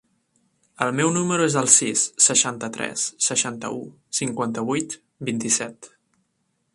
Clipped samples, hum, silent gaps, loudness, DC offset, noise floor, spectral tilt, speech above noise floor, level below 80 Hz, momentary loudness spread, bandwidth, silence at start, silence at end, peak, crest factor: under 0.1%; none; none; -21 LUFS; under 0.1%; -72 dBFS; -2.5 dB/octave; 49 dB; -66 dBFS; 16 LU; 13.5 kHz; 0.8 s; 0.9 s; 0 dBFS; 24 dB